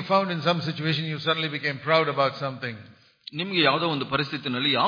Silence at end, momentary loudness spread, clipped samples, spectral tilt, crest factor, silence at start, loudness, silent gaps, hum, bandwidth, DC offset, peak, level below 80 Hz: 0 s; 13 LU; under 0.1%; -6.5 dB/octave; 20 dB; 0 s; -25 LUFS; none; none; 5.2 kHz; under 0.1%; -6 dBFS; -66 dBFS